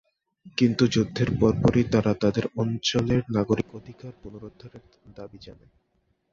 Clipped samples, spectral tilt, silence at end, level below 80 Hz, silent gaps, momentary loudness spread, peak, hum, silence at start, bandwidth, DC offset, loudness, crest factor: under 0.1%; -6.5 dB/octave; 0.8 s; -48 dBFS; none; 22 LU; -6 dBFS; none; 0.45 s; 7.6 kHz; under 0.1%; -24 LUFS; 20 dB